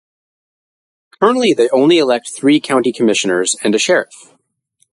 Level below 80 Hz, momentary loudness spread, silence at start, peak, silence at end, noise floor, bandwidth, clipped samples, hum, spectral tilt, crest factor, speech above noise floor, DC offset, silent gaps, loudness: -64 dBFS; 5 LU; 1.2 s; 0 dBFS; 0.9 s; -62 dBFS; 11.5 kHz; under 0.1%; none; -3.5 dB/octave; 14 dB; 49 dB; under 0.1%; none; -13 LUFS